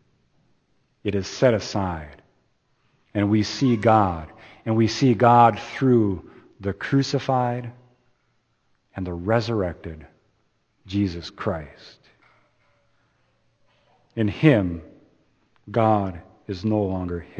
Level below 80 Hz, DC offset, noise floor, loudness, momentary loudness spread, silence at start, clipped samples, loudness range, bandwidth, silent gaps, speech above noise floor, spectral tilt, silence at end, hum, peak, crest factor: -52 dBFS; under 0.1%; -68 dBFS; -22 LUFS; 17 LU; 1.05 s; under 0.1%; 13 LU; 8.2 kHz; none; 47 dB; -7 dB/octave; 0 s; none; -2 dBFS; 22 dB